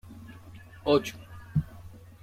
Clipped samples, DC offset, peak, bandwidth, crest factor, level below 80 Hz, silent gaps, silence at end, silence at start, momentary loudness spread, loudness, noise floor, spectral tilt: under 0.1%; under 0.1%; -12 dBFS; 16 kHz; 20 dB; -54 dBFS; none; 0.25 s; 0.05 s; 23 LU; -29 LUFS; -48 dBFS; -6.5 dB/octave